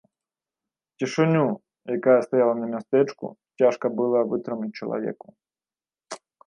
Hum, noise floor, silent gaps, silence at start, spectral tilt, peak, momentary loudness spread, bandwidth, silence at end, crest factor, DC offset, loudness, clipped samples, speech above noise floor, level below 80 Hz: none; under -90 dBFS; none; 1 s; -7 dB/octave; -6 dBFS; 18 LU; 10.5 kHz; 0.3 s; 18 dB; under 0.1%; -24 LUFS; under 0.1%; over 67 dB; -76 dBFS